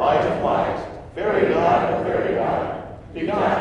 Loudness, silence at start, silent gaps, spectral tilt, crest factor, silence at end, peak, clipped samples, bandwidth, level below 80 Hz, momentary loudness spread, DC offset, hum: -21 LUFS; 0 s; none; -7 dB/octave; 16 dB; 0 s; -4 dBFS; under 0.1%; 10 kHz; -46 dBFS; 12 LU; under 0.1%; none